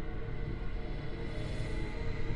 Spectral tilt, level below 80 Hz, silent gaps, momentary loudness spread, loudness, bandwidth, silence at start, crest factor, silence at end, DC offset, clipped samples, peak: -7 dB/octave; -38 dBFS; none; 3 LU; -40 LUFS; 11 kHz; 0 s; 14 dB; 0 s; under 0.1%; under 0.1%; -22 dBFS